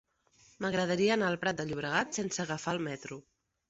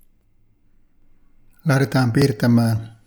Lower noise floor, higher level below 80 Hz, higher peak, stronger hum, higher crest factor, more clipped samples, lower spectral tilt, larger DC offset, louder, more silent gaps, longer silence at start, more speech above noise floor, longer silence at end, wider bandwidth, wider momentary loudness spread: first, -65 dBFS vs -57 dBFS; second, -66 dBFS vs -52 dBFS; second, -14 dBFS vs -4 dBFS; neither; about the same, 20 dB vs 16 dB; neither; second, -4 dB/octave vs -7 dB/octave; neither; second, -32 LUFS vs -19 LUFS; neither; second, 0.6 s vs 1.65 s; second, 33 dB vs 39 dB; first, 0.5 s vs 0.15 s; second, 8.2 kHz vs over 20 kHz; first, 11 LU vs 5 LU